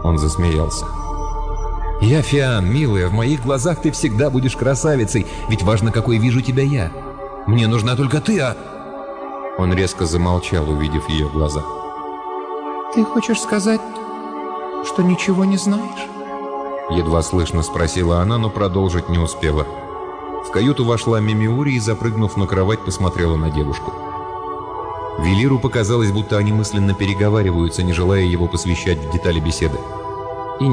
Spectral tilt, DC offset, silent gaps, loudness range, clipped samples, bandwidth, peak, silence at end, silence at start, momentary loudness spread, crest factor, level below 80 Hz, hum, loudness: -6 dB/octave; under 0.1%; none; 3 LU; under 0.1%; 10 kHz; -6 dBFS; 0 s; 0 s; 11 LU; 12 dB; -30 dBFS; none; -19 LUFS